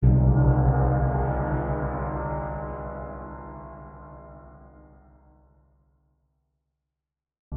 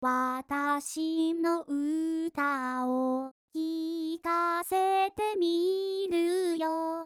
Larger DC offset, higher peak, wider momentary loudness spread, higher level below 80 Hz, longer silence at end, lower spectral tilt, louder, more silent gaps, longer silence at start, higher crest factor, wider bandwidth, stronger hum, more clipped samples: neither; first, -8 dBFS vs -18 dBFS; first, 24 LU vs 5 LU; first, -32 dBFS vs -70 dBFS; about the same, 0 s vs 0 s; first, -14 dB/octave vs -3 dB/octave; first, -25 LUFS vs -30 LUFS; about the same, 7.39-7.51 s vs 3.31-3.48 s; about the same, 0 s vs 0 s; first, 18 dB vs 12 dB; second, 2.4 kHz vs 15.5 kHz; first, 50 Hz at -50 dBFS vs none; neither